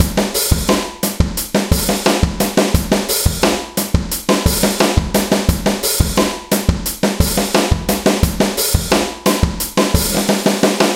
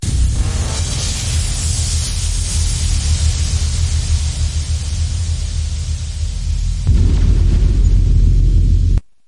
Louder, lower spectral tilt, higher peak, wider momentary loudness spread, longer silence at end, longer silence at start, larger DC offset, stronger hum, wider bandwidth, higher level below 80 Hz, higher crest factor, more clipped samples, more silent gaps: about the same, -15 LUFS vs -17 LUFS; about the same, -4 dB/octave vs -4 dB/octave; about the same, 0 dBFS vs -2 dBFS; second, 4 LU vs 7 LU; second, 0 s vs 0.25 s; about the same, 0 s vs 0 s; second, under 0.1% vs 0.3%; neither; first, 17 kHz vs 11.5 kHz; second, -24 dBFS vs -16 dBFS; about the same, 16 dB vs 12 dB; neither; neither